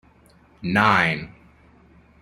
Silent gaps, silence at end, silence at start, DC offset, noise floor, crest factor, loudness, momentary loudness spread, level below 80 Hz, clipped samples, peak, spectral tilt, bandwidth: none; 0.95 s; 0.6 s; under 0.1%; -54 dBFS; 22 dB; -20 LUFS; 17 LU; -54 dBFS; under 0.1%; -2 dBFS; -5.5 dB/octave; 16 kHz